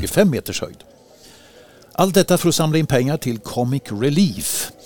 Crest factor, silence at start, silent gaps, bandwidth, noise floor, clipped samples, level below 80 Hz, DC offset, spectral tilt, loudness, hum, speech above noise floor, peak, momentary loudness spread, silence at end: 18 dB; 0 s; none; 20 kHz; -47 dBFS; under 0.1%; -46 dBFS; under 0.1%; -5 dB/octave; -19 LUFS; none; 28 dB; 0 dBFS; 9 LU; 0 s